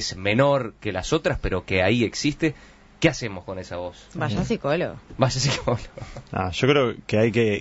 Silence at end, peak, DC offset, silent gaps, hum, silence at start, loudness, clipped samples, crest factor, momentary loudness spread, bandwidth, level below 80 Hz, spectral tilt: 0 s; -2 dBFS; under 0.1%; none; none; 0 s; -23 LUFS; under 0.1%; 20 dB; 12 LU; 8 kHz; -42 dBFS; -5 dB/octave